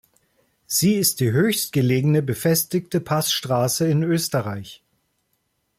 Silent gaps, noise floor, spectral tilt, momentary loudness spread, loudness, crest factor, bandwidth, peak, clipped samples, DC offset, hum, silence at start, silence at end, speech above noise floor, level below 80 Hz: none; -71 dBFS; -4.5 dB/octave; 6 LU; -21 LUFS; 16 dB; 16.5 kHz; -6 dBFS; under 0.1%; under 0.1%; none; 0.7 s; 1.05 s; 51 dB; -58 dBFS